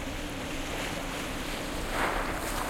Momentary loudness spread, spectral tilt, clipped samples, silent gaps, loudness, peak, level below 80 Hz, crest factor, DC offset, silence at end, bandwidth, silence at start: 6 LU; -3.5 dB/octave; under 0.1%; none; -33 LUFS; -16 dBFS; -40 dBFS; 16 dB; under 0.1%; 0 s; 16.5 kHz; 0 s